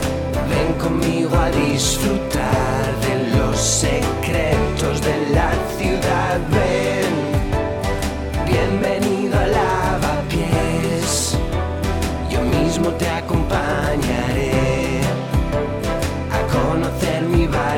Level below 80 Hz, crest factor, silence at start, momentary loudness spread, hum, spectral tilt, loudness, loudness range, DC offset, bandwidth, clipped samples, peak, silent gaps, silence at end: -28 dBFS; 16 dB; 0 s; 4 LU; none; -5 dB/octave; -19 LUFS; 2 LU; under 0.1%; 18 kHz; under 0.1%; -2 dBFS; none; 0 s